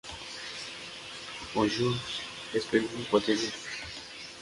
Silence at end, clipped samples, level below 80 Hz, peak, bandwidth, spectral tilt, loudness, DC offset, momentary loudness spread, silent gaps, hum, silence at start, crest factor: 0 s; under 0.1%; -60 dBFS; -10 dBFS; 11.5 kHz; -4 dB/octave; -32 LUFS; under 0.1%; 13 LU; none; none; 0.05 s; 22 dB